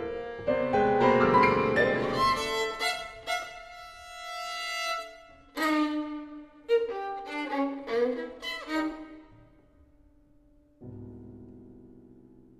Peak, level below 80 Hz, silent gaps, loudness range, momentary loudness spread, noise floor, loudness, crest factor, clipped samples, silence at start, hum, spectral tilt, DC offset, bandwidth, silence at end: -10 dBFS; -56 dBFS; none; 13 LU; 22 LU; -60 dBFS; -28 LUFS; 20 dB; under 0.1%; 0 s; none; -4.5 dB/octave; under 0.1%; 14 kHz; 0.5 s